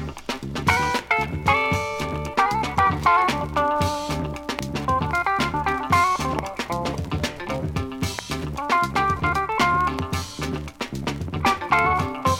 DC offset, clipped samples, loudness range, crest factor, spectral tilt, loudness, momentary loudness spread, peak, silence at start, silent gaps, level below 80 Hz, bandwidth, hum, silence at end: under 0.1%; under 0.1%; 3 LU; 18 dB; -4.5 dB/octave; -23 LUFS; 9 LU; -6 dBFS; 0 s; none; -40 dBFS; 17 kHz; none; 0 s